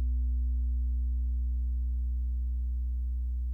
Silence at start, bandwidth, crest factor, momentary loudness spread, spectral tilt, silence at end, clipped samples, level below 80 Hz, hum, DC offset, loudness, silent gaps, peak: 0 s; 0.4 kHz; 4 dB; 3 LU; -11 dB/octave; 0 s; under 0.1%; -30 dBFS; 60 Hz at -65 dBFS; under 0.1%; -33 LUFS; none; -24 dBFS